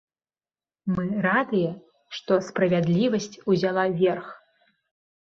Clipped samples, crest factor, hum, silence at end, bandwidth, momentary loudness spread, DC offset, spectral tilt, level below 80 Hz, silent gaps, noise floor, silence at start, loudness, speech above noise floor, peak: under 0.1%; 18 dB; none; 0.85 s; 7.6 kHz; 14 LU; under 0.1%; -6.5 dB/octave; -62 dBFS; none; under -90 dBFS; 0.85 s; -24 LUFS; over 67 dB; -8 dBFS